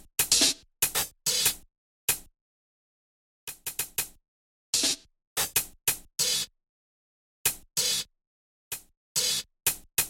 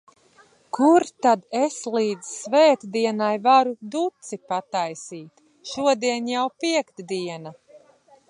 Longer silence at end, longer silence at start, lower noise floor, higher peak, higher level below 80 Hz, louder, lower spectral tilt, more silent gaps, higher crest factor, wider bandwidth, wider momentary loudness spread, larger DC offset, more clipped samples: second, 0 s vs 0.55 s; second, 0.2 s vs 0.75 s; first, under -90 dBFS vs -56 dBFS; about the same, -8 dBFS vs -6 dBFS; first, -58 dBFS vs -76 dBFS; second, -27 LUFS vs -22 LUFS; second, 0.5 dB/octave vs -4 dB/octave; first, 1.78-2.08 s, 2.41-3.47 s, 4.28-4.73 s, 5.27-5.36 s, 6.69-7.45 s, 8.27-8.71 s, 8.97-9.15 s vs none; first, 24 dB vs 18 dB; first, 17 kHz vs 11.5 kHz; about the same, 15 LU vs 17 LU; neither; neither